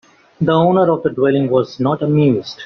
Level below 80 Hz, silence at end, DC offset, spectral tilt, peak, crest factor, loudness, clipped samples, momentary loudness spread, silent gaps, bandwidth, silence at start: -54 dBFS; 0 s; under 0.1%; -7 dB/octave; -2 dBFS; 12 dB; -15 LUFS; under 0.1%; 5 LU; none; 6.4 kHz; 0.4 s